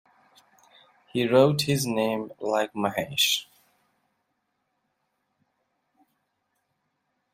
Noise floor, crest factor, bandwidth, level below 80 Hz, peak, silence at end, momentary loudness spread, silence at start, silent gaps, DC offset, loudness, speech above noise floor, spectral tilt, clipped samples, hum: -77 dBFS; 24 dB; 16 kHz; -68 dBFS; -6 dBFS; 3.9 s; 9 LU; 1.15 s; none; under 0.1%; -24 LUFS; 53 dB; -4 dB/octave; under 0.1%; none